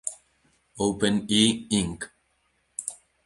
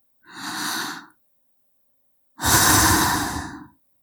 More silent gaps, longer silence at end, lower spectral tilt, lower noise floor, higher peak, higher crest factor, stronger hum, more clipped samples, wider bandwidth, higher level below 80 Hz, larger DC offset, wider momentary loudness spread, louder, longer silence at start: neither; about the same, 0.3 s vs 0.35 s; first, -3.5 dB/octave vs -2 dB/octave; first, -70 dBFS vs -64 dBFS; second, -6 dBFS vs -2 dBFS; about the same, 22 dB vs 20 dB; neither; neither; second, 11.5 kHz vs over 20 kHz; second, -54 dBFS vs -42 dBFS; neither; second, 17 LU vs 20 LU; second, -25 LUFS vs -19 LUFS; second, 0.05 s vs 0.3 s